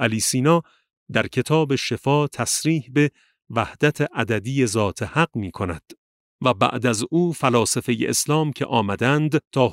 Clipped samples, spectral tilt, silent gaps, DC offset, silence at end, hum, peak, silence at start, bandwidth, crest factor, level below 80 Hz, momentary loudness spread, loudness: under 0.1%; -4.5 dB/octave; 0.97-1.06 s, 5.98-6.39 s, 9.47-9.51 s; under 0.1%; 0 s; none; -2 dBFS; 0 s; 16 kHz; 18 dB; -54 dBFS; 5 LU; -21 LUFS